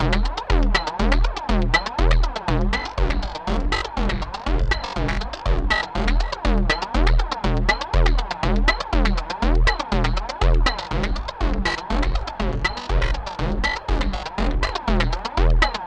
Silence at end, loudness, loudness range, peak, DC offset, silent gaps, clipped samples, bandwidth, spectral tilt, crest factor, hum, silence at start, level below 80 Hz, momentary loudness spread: 0 s; -23 LUFS; 3 LU; -2 dBFS; under 0.1%; none; under 0.1%; 8.6 kHz; -5.5 dB/octave; 18 dB; none; 0 s; -22 dBFS; 6 LU